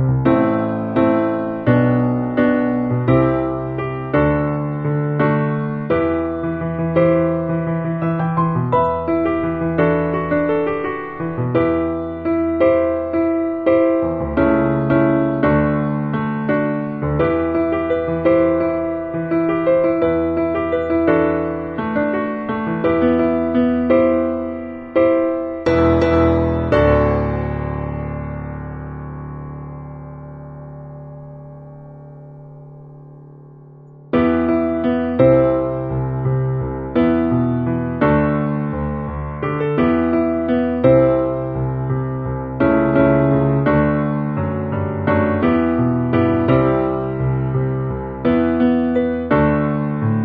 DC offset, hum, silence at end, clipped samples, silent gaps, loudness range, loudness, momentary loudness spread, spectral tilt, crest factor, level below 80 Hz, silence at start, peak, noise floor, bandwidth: under 0.1%; none; 0 s; under 0.1%; none; 6 LU; -18 LUFS; 10 LU; -10.5 dB/octave; 16 dB; -38 dBFS; 0 s; -2 dBFS; -41 dBFS; 6 kHz